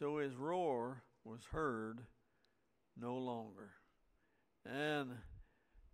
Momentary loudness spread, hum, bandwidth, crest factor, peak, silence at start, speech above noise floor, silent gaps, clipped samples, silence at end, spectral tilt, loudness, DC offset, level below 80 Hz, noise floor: 19 LU; none; 15.5 kHz; 18 dB; -28 dBFS; 0 s; 38 dB; none; under 0.1%; 0.05 s; -6.5 dB/octave; -43 LUFS; under 0.1%; -66 dBFS; -82 dBFS